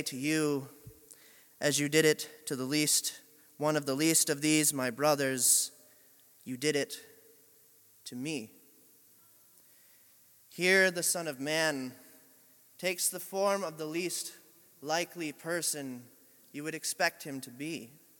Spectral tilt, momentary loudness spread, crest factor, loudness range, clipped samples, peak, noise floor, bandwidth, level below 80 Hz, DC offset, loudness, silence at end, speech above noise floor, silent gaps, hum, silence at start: -2.5 dB/octave; 18 LU; 22 dB; 10 LU; under 0.1%; -12 dBFS; -62 dBFS; 17.5 kHz; -80 dBFS; under 0.1%; -30 LUFS; 0.3 s; 31 dB; none; none; 0 s